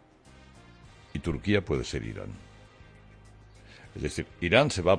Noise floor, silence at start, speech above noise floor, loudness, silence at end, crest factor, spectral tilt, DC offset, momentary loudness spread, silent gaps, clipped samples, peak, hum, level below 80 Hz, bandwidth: -55 dBFS; 1.15 s; 27 dB; -29 LUFS; 0 s; 24 dB; -5.5 dB/octave; under 0.1%; 22 LU; none; under 0.1%; -8 dBFS; none; -48 dBFS; 10.5 kHz